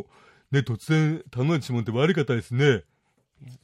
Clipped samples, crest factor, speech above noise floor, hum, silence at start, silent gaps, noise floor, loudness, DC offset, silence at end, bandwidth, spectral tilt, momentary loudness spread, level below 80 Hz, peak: under 0.1%; 18 dB; 38 dB; none; 0.5 s; none; -62 dBFS; -24 LUFS; under 0.1%; 0.05 s; 12 kHz; -7 dB/octave; 5 LU; -62 dBFS; -8 dBFS